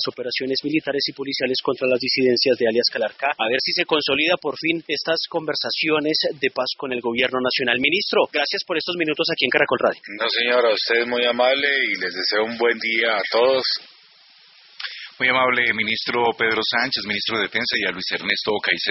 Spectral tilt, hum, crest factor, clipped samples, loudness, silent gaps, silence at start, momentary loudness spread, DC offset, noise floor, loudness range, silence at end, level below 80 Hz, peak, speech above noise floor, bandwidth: -0.5 dB/octave; none; 20 dB; under 0.1%; -20 LUFS; none; 0 s; 6 LU; under 0.1%; -51 dBFS; 2 LU; 0 s; -64 dBFS; -2 dBFS; 30 dB; 6 kHz